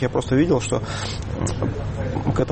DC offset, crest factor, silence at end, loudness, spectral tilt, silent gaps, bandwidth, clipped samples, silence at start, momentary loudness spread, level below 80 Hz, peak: under 0.1%; 14 dB; 0 s; -23 LUFS; -6 dB/octave; none; 8.8 kHz; under 0.1%; 0 s; 8 LU; -36 dBFS; -6 dBFS